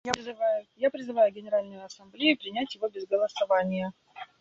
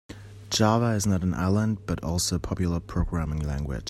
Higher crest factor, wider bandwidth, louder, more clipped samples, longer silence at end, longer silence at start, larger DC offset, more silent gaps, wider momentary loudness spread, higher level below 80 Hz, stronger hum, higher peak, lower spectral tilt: first, 28 dB vs 18 dB; second, 7.8 kHz vs 14 kHz; about the same, -28 LUFS vs -26 LUFS; neither; first, 0.15 s vs 0 s; about the same, 0.05 s vs 0.1 s; neither; neither; first, 17 LU vs 8 LU; second, -70 dBFS vs -38 dBFS; neither; first, -2 dBFS vs -8 dBFS; about the same, -4.5 dB/octave vs -5.5 dB/octave